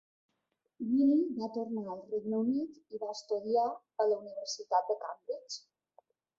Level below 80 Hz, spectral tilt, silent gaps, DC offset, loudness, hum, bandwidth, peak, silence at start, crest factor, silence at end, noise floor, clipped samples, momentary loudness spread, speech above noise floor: -82 dBFS; -5 dB/octave; none; under 0.1%; -34 LUFS; none; 7.8 kHz; -16 dBFS; 0.8 s; 18 dB; 0.8 s; -82 dBFS; under 0.1%; 13 LU; 49 dB